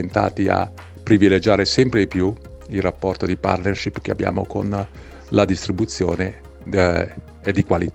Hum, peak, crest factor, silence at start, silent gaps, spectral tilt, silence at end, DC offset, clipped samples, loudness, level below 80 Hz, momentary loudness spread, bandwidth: none; 0 dBFS; 20 dB; 0 s; none; -6 dB/octave; 0.05 s; under 0.1%; under 0.1%; -20 LUFS; -40 dBFS; 12 LU; 9 kHz